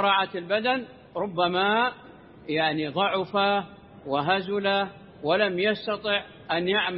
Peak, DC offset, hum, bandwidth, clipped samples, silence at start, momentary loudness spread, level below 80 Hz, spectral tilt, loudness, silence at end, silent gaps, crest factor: -8 dBFS; under 0.1%; none; 5.8 kHz; under 0.1%; 0 s; 11 LU; -64 dBFS; -9 dB/octave; -26 LUFS; 0 s; none; 18 dB